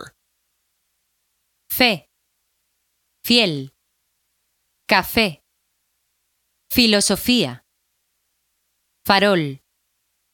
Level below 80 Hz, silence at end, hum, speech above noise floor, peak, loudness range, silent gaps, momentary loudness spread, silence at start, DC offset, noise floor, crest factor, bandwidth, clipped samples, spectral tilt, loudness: -50 dBFS; 0.75 s; none; 54 dB; 0 dBFS; 4 LU; none; 17 LU; 0 s; under 0.1%; -71 dBFS; 22 dB; 18 kHz; under 0.1%; -3 dB/octave; -18 LUFS